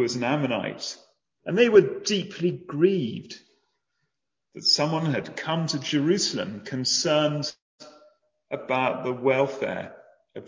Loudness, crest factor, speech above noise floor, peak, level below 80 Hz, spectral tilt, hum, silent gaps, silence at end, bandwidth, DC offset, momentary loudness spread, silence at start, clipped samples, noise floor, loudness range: -24 LUFS; 22 dB; 57 dB; -4 dBFS; -68 dBFS; -4.5 dB/octave; none; 7.62-7.78 s; 0 s; 7.8 kHz; under 0.1%; 15 LU; 0 s; under 0.1%; -81 dBFS; 3 LU